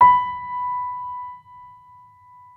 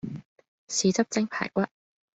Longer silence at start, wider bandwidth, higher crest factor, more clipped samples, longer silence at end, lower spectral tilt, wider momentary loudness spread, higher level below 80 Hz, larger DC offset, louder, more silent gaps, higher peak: about the same, 0 s vs 0.05 s; second, 4 kHz vs 8.2 kHz; about the same, 20 dB vs 20 dB; neither; first, 0.85 s vs 0.5 s; first, -6 dB/octave vs -4 dB/octave; first, 24 LU vs 13 LU; first, -60 dBFS vs -66 dBFS; neither; first, -23 LUFS vs -27 LUFS; second, none vs 0.25-0.36 s, 0.48-0.68 s; first, -2 dBFS vs -10 dBFS